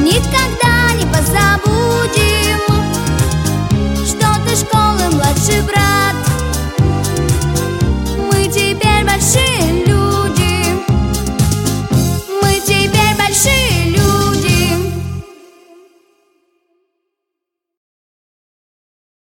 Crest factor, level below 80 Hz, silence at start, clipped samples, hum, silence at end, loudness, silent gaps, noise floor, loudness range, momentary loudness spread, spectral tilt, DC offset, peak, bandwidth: 14 dB; -24 dBFS; 0 s; under 0.1%; none; 3.95 s; -13 LUFS; none; -79 dBFS; 3 LU; 5 LU; -4.5 dB/octave; under 0.1%; 0 dBFS; 17 kHz